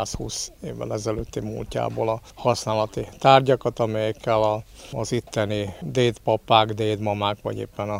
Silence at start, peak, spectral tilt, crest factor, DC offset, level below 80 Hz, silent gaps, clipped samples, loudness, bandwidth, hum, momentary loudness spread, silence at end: 0 s; 0 dBFS; -5 dB/octave; 24 dB; under 0.1%; -46 dBFS; none; under 0.1%; -24 LUFS; 16 kHz; none; 12 LU; 0 s